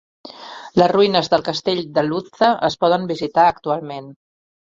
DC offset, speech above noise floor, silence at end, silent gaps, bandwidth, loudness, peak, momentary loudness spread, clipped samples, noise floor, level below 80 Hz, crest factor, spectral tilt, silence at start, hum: under 0.1%; 19 dB; 0.65 s; none; 7.6 kHz; -18 LUFS; -2 dBFS; 17 LU; under 0.1%; -37 dBFS; -58 dBFS; 18 dB; -5.5 dB/octave; 0.25 s; none